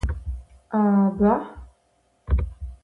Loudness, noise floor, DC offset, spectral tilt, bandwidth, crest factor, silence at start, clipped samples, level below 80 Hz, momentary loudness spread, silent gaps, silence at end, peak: -23 LUFS; -65 dBFS; under 0.1%; -10 dB/octave; 3.8 kHz; 16 dB; 0.05 s; under 0.1%; -32 dBFS; 18 LU; none; 0.1 s; -8 dBFS